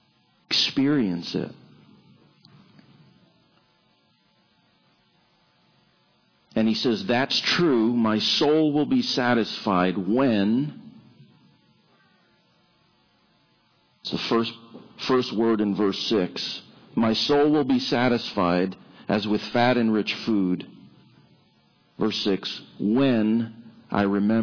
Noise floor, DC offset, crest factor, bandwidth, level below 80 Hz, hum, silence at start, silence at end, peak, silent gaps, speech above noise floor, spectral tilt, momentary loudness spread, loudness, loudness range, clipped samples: -64 dBFS; under 0.1%; 16 dB; 5.4 kHz; -62 dBFS; none; 0.5 s; 0 s; -8 dBFS; none; 42 dB; -5.5 dB/octave; 11 LU; -23 LUFS; 11 LU; under 0.1%